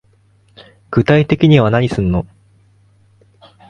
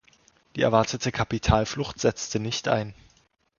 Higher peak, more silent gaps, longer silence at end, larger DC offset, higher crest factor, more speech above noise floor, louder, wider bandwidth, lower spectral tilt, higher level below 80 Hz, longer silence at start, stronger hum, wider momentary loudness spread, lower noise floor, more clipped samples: first, 0 dBFS vs -6 dBFS; neither; first, 1.45 s vs 0.65 s; neither; second, 16 dB vs 22 dB; about the same, 41 dB vs 39 dB; first, -13 LUFS vs -25 LUFS; first, 9 kHz vs 7.4 kHz; first, -8 dB/octave vs -5 dB/octave; about the same, -38 dBFS vs -40 dBFS; first, 0.9 s vs 0.55 s; first, 50 Hz at -30 dBFS vs none; about the same, 10 LU vs 8 LU; second, -53 dBFS vs -64 dBFS; neither